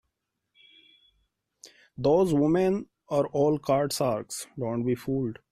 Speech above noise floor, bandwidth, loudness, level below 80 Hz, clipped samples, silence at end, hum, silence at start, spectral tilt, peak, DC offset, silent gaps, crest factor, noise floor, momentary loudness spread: 56 dB; 14.5 kHz; -27 LUFS; -60 dBFS; under 0.1%; 0.2 s; none; 1.65 s; -6 dB/octave; -12 dBFS; under 0.1%; none; 16 dB; -81 dBFS; 10 LU